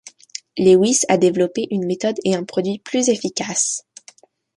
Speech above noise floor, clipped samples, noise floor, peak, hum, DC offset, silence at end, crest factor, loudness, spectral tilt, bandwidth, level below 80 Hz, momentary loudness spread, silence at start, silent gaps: 32 dB; under 0.1%; -49 dBFS; -2 dBFS; none; under 0.1%; 0.8 s; 18 dB; -18 LUFS; -4 dB/octave; 11.5 kHz; -62 dBFS; 11 LU; 0.05 s; none